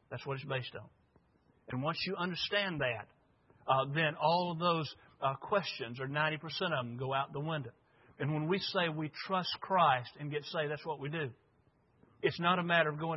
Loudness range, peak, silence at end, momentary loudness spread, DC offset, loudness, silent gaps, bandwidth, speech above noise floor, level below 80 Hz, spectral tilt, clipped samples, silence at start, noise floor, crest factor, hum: 3 LU; -14 dBFS; 0 s; 11 LU; under 0.1%; -34 LUFS; none; 5.8 kHz; 36 dB; -74 dBFS; -3 dB/octave; under 0.1%; 0.1 s; -71 dBFS; 22 dB; none